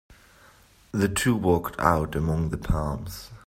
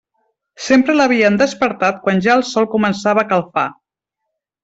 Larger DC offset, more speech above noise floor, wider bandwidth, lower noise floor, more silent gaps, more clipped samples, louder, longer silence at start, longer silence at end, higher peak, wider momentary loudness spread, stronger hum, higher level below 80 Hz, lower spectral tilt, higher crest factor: neither; second, 30 dB vs 64 dB; first, 16 kHz vs 8 kHz; second, -55 dBFS vs -78 dBFS; neither; neither; second, -25 LUFS vs -15 LUFS; second, 0.1 s vs 0.6 s; second, 0.1 s vs 0.9 s; about the same, -4 dBFS vs -2 dBFS; first, 10 LU vs 7 LU; neither; first, -38 dBFS vs -56 dBFS; about the same, -6 dB/octave vs -5 dB/octave; first, 22 dB vs 14 dB